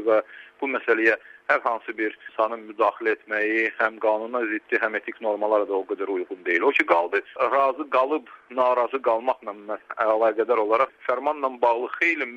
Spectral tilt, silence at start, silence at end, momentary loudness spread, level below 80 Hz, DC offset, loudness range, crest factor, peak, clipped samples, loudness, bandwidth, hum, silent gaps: -4.5 dB/octave; 0 s; 0 s; 8 LU; -74 dBFS; under 0.1%; 2 LU; 20 dB; -4 dBFS; under 0.1%; -24 LUFS; 7.6 kHz; none; none